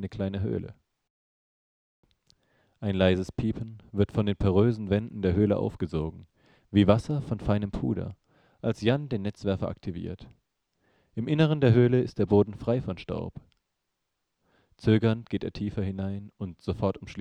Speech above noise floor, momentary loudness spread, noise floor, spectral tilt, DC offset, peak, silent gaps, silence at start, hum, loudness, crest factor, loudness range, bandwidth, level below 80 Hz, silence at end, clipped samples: 55 dB; 13 LU; -81 dBFS; -8.5 dB/octave; under 0.1%; -4 dBFS; 1.10-2.03 s; 0 s; none; -28 LUFS; 24 dB; 6 LU; 9.4 kHz; -48 dBFS; 0 s; under 0.1%